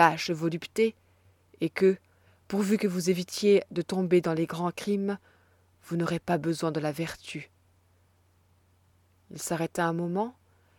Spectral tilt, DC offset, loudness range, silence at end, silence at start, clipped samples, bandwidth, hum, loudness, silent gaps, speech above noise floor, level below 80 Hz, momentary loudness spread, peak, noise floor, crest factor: -5.5 dB/octave; under 0.1%; 8 LU; 0.45 s; 0 s; under 0.1%; 18 kHz; none; -29 LUFS; none; 38 dB; -68 dBFS; 11 LU; -6 dBFS; -65 dBFS; 22 dB